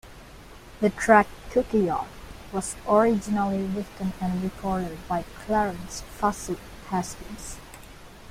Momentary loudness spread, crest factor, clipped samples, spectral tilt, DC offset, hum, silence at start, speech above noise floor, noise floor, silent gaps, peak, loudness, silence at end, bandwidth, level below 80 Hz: 23 LU; 22 dB; under 0.1%; -5.5 dB/octave; under 0.1%; none; 0.05 s; 20 dB; -46 dBFS; none; -4 dBFS; -26 LUFS; 0 s; 16 kHz; -46 dBFS